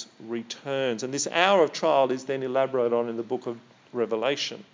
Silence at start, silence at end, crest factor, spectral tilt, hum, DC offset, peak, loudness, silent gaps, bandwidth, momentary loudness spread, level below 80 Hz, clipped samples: 0 s; 0.1 s; 22 dB; -3.5 dB/octave; none; under 0.1%; -4 dBFS; -26 LUFS; none; 7.6 kHz; 14 LU; -84 dBFS; under 0.1%